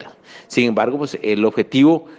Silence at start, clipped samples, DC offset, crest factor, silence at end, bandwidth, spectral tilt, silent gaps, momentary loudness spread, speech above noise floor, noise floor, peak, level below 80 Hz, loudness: 0 s; under 0.1%; under 0.1%; 14 dB; 0.05 s; 9.2 kHz; -6 dB/octave; none; 8 LU; 25 dB; -41 dBFS; -2 dBFS; -62 dBFS; -17 LUFS